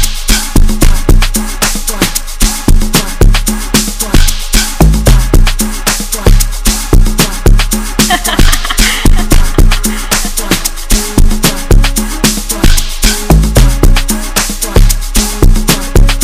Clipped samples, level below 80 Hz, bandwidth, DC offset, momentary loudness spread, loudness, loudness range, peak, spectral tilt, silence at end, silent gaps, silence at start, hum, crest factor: 4%; -8 dBFS; 16 kHz; under 0.1%; 4 LU; -10 LUFS; 1 LU; 0 dBFS; -3.5 dB/octave; 0 s; none; 0 s; none; 8 dB